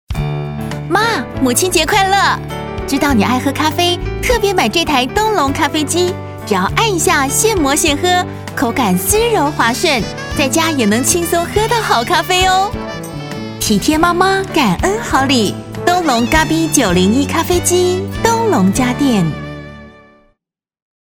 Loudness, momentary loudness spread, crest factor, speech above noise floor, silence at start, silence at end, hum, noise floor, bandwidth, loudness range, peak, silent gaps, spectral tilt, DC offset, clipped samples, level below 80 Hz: -13 LUFS; 9 LU; 14 dB; 59 dB; 0.1 s; 1.15 s; none; -73 dBFS; over 20 kHz; 1 LU; 0 dBFS; none; -3.5 dB/octave; under 0.1%; under 0.1%; -32 dBFS